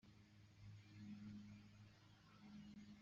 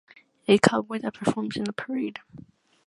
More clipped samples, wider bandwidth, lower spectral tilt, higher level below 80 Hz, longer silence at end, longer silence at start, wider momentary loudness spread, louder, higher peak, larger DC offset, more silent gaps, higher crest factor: neither; second, 7.4 kHz vs 11.5 kHz; about the same, -6 dB/octave vs -5 dB/octave; second, -80 dBFS vs -64 dBFS; second, 0 s vs 0.45 s; second, 0.05 s vs 0.5 s; second, 11 LU vs 14 LU; second, -62 LUFS vs -26 LUFS; second, -48 dBFS vs 0 dBFS; neither; neither; second, 14 dB vs 26 dB